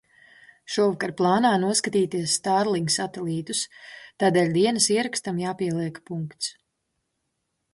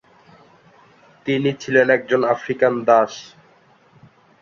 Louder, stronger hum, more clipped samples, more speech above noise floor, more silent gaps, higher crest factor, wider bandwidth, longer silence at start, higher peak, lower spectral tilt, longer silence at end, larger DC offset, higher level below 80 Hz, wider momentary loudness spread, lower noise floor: second, -24 LUFS vs -18 LUFS; neither; neither; first, 54 dB vs 36 dB; neither; about the same, 18 dB vs 20 dB; first, 12 kHz vs 7.4 kHz; second, 0.7 s vs 1.25 s; second, -8 dBFS vs -2 dBFS; second, -4 dB/octave vs -5.5 dB/octave; about the same, 1.2 s vs 1.2 s; neither; about the same, -68 dBFS vs -64 dBFS; first, 12 LU vs 9 LU; first, -77 dBFS vs -54 dBFS